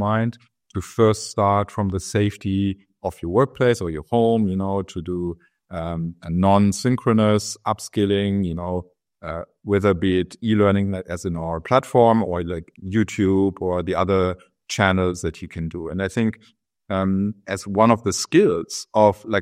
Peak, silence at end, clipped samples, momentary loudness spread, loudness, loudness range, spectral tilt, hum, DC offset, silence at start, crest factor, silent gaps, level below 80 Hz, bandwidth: 0 dBFS; 0 s; under 0.1%; 13 LU; -21 LUFS; 3 LU; -6 dB/octave; none; under 0.1%; 0 s; 20 dB; none; -52 dBFS; 14.5 kHz